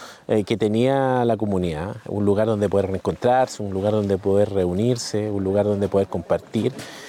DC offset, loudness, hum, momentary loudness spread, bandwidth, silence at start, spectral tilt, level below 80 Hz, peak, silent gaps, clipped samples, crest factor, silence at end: under 0.1%; -22 LUFS; none; 5 LU; 15 kHz; 0 s; -6.5 dB/octave; -56 dBFS; -8 dBFS; none; under 0.1%; 14 dB; 0 s